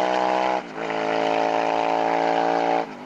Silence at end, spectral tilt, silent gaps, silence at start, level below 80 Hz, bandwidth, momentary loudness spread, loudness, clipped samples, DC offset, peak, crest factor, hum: 0 s; -4.5 dB/octave; none; 0 s; -64 dBFS; 9.2 kHz; 4 LU; -22 LUFS; under 0.1%; under 0.1%; -10 dBFS; 12 dB; none